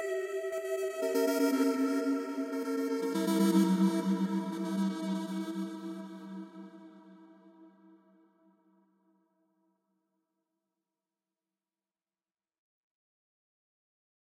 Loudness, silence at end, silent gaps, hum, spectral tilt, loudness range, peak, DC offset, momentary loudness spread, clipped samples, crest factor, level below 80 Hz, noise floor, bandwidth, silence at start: -32 LUFS; 6.65 s; none; none; -6 dB/octave; 18 LU; -16 dBFS; under 0.1%; 17 LU; under 0.1%; 20 dB; under -90 dBFS; under -90 dBFS; 16 kHz; 0 s